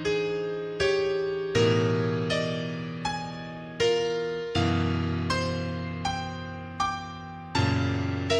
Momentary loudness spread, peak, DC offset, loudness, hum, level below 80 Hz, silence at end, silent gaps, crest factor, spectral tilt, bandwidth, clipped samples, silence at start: 11 LU; -12 dBFS; under 0.1%; -28 LUFS; none; -52 dBFS; 0 s; none; 16 dB; -5.5 dB/octave; 10.5 kHz; under 0.1%; 0 s